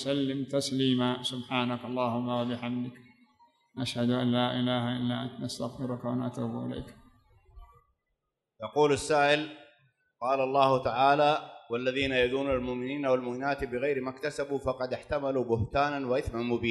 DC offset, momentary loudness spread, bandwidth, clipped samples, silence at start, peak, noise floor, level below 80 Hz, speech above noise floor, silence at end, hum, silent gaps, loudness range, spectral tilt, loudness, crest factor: under 0.1%; 11 LU; 12 kHz; under 0.1%; 0 s; -8 dBFS; -83 dBFS; -56 dBFS; 54 dB; 0 s; none; none; 7 LU; -5.5 dB/octave; -29 LUFS; 22 dB